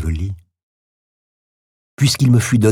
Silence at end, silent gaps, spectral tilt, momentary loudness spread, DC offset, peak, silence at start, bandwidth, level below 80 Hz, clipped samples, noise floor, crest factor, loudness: 0 s; 0.63-1.97 s; -5.5 dB/octave; 14 LU; under 0.1%; -2 dBFS; 0 s; 15.5 kHz; -34 dBFS; under 0.1%; under -90 dBFS; 16 dB; -16 LUFS